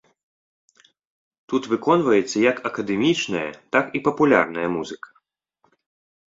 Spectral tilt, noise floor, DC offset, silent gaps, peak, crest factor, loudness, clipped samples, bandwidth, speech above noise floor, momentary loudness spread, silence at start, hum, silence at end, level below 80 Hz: -5 dB/octave; -67 dBFS; under 0.1%; none; -2 dBFS; 20 dB; -21 LUFS; under 0.1%; 7.8 kHz; 47 dB; 10 LU; 1.5 s; none; 1.25 s; -62 dBFS